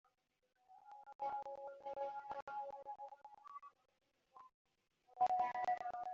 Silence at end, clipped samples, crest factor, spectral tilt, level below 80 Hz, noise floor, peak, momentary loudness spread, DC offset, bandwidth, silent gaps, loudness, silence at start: 0 s; under 0.1%; 20 dB; -1.5 dB/octave; -86 dBFS; -66 dBFS; -26 dBFS; 25 LU; under 0.1%; 7.4 kHz; 1.15-1.19 s, 2.42-2.47 s, 4.54-4.65 s; -44 LUFS; 0.7 s